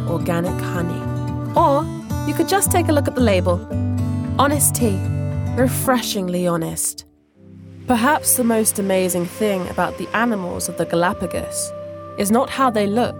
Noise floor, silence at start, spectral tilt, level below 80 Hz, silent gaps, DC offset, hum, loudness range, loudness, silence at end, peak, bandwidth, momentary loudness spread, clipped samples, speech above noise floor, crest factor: -47 dBFS; 0 s; -4.5 dB/octave; -46 dBFS; none; under 0.1%; none; 3 LU; -19 LUFS; 0 s; -2 dBFS; over 20 kHz; 9 LU; under 0.1%; 28 dB; 18 dB